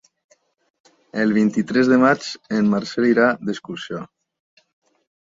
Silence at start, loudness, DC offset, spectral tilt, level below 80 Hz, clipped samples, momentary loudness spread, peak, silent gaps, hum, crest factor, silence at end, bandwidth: 1.15 s; -19 LUFS; under 0.1%; -6 dB/octave; -64 dBFS; under 0.1%; 15 LU; -2 dBFS; none; none; 18 dB; 1.2 s; 7.8 kHz